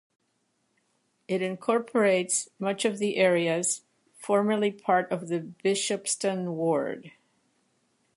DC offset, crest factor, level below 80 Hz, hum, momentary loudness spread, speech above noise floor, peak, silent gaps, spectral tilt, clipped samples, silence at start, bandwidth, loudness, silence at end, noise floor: under 0.1%; 18 dB; -78 dBFS; none; 9 LU; 47 dB; -10 dBFS; none; -4 dB/octave; under 0.1%; 1.3 s; 11.5 kHz; -27 LUFS; 1.05 s; -74 dBFS